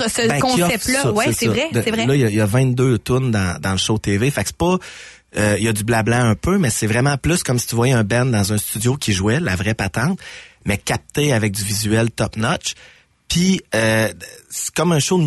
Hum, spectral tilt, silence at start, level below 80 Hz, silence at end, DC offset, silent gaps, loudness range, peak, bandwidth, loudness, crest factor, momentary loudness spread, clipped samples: none; -4.5 dB/octave; 0 s; -40 dBFS; 0 s; under 0.1%; none; 3 LU; -6 dBFS; 12.5 kHz; -18 LUFS; 12 dB; 7 LU; under 0.1%